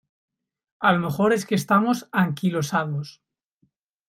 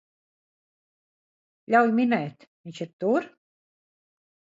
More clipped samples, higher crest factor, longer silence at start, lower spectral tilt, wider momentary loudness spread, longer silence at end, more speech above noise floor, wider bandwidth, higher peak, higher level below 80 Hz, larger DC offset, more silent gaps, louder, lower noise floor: neither; about the same, 20 dB vs 22 dB; second, 0.8 s vs 1.7 s; about the same, -6 dB/octave vs -7 dB/octave; second, 7 LU vs 19 LU; second, 1 s vs 1.25 s; second, 47 dB vs over 66 dB; first, 16 kHz vs 7.8 kHz; about the same, -4 dBFS vs -6 dBFS; first, -64 dBFS vs -78 dBFS; neither; second, none vs 2.47-2.64 s, 2.93-2.99 s; about the same, -22 LUFS vs -24 LUFS; second, -69 dBFS vs under -90 dBFS